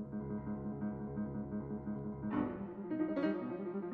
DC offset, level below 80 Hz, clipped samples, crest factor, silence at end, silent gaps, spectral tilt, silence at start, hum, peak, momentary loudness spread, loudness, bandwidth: under 0.1%; -60 dBFS; under 0.1%; 16 dB; 0 s; none; -8 dB/octave; 0 s; none; -24 dBFS; 6 LU; -40 LUFS; 4.6 kHz